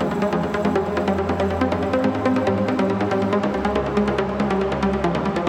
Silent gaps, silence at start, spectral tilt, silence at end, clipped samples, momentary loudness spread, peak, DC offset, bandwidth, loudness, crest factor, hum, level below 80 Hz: none; 0 s; -7 dB/octave; 0 s; under 0.1%; 2 LU; -6 dBFS; under 0.1%; 11 kHz; -21 LUFS; 14 dB; none; -40 dBFS